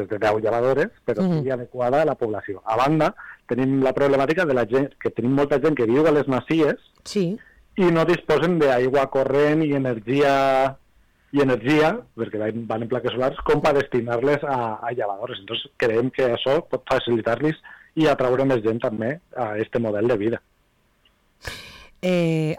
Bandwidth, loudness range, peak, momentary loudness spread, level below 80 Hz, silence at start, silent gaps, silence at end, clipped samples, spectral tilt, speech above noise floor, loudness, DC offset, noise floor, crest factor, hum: 15.5 kHz; 3 LU; -12 dBFS; 10 LU; -52 dBFS; 0 s; none; 0 s; under 0.1%; -7 dB/octave; 42 dB; -22 LUFS; under 0.1%; -63 dBFS; 10 dB; none